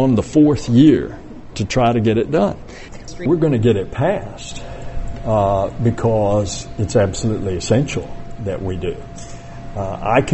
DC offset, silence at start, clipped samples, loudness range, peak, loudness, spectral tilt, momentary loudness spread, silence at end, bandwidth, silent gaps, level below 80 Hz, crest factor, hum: under 0.1%; 0 s; under 0.1%; 5 LU; -2 dBFS; -18 LUFS; -6.5 dB/octave; 19 LU; 0 s; 8.4 kHz; none; -34 dBFS; 16 dB; none